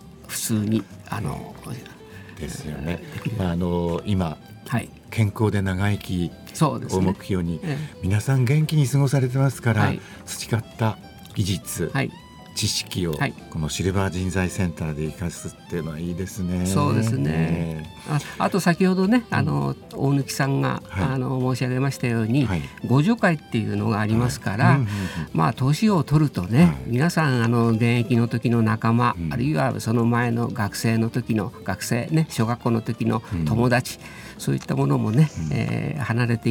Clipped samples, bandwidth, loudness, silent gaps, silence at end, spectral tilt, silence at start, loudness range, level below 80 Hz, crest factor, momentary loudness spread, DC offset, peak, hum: under 0.1%; 19 kHz; -23 LUFS; none; 0 s; -6 dB/octave; 0 s; 6 LU; -48 dBFS; 18 dB; 11 LU; under 0.1%; -4 dBFS; none